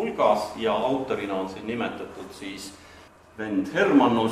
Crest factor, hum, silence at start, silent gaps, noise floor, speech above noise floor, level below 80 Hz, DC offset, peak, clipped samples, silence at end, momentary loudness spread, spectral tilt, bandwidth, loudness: 18 dB; none; 0 s; none; -50 dBFS; 25 dB; -60 dBFS; under 0.1%; -8 dBFS; under 0.1%; 0 s; 18 LU; -5.5 dB/octave; 13.5 kHz; -24 LUFS